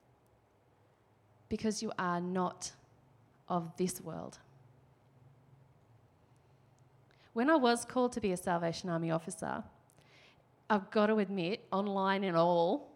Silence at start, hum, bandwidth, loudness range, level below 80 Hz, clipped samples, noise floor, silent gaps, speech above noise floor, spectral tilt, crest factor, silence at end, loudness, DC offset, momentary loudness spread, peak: 1.5 s; none; 15.5 kHz; 9 LU; -70 dBFS; under 0.1%; -69 dBFS; none; 36 dB; -5.5 dB/octave; 20 dB; 0.05 s; -34 LUFS; under 0.1%; 13 LU; -16 dBFS